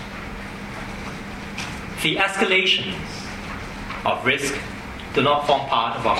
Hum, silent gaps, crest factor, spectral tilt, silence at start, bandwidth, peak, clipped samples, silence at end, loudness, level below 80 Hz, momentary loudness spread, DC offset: none; none; 18 dB; -3.5 dB/octave; 0 s; 16 kHz; -6 dBFS; under 0.1%; 0 s; -22 LUFS; -42 dBFS; 15 LU; under 0.1%